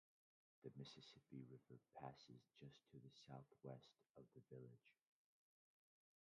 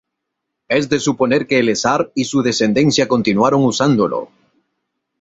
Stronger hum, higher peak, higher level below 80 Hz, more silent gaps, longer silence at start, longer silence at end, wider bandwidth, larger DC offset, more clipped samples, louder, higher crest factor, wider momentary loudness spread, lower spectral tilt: neither; second, -40 dBFS vs -2 dBFS; second, under -90 dBFS vs -54 dBFS; first, 4.10-4.14 s vs none; about the same, 0.6 s vs 0.7 s; first, 1.3 s vs 0.95 s; about the same, 7.4 kHz vs 8 kHz; neither; neither; second, -63 LUFS vs -16 LUFS; first, 24 dB vs 14 dB; first, 7 LU vs 4 LU; about the same, -5.5 dB/octave vs -5 dB/octave